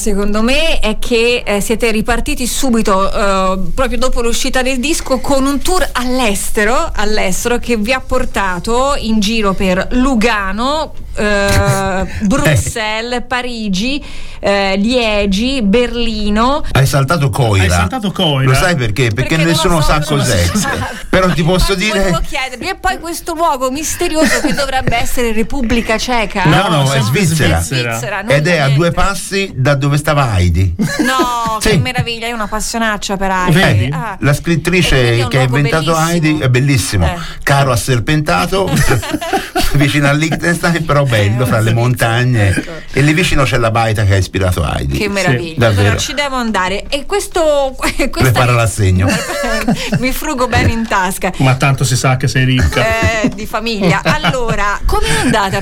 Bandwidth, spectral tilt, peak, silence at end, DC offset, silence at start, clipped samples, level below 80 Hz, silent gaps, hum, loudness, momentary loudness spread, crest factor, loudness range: 17 kHz; -5 dB/octave; 0 dBFS; 0 s; under 0.1%; 0 s; under 0.1%; -22 dBFS; none; none; -13 LUFS; 5 LU; 12 dB; 2 LU